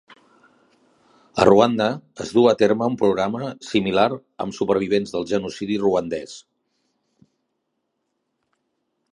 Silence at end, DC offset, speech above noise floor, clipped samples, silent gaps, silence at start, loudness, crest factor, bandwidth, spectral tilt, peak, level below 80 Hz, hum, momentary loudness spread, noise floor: 2.75 s; under 0.1%; 56 dB; under 0.1%; none; 1.35 s; -20 LUFS; 22 dB; 11 kHz; -6 dB/octave; 0 dBFS; -56 dBFS; none; 14 LU; -75 dBFS